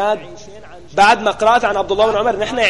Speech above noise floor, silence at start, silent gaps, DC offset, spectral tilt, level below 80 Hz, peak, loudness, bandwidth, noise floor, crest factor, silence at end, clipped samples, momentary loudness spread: 23 dB; 0 s; none; 1%; -3.5 dB/octave; -44 dBFS; -2 dBFS; -15 LUFS; 11.5 kHz; -38 dBFS; 14 dB; 0 s; under 0.1%; 12 LU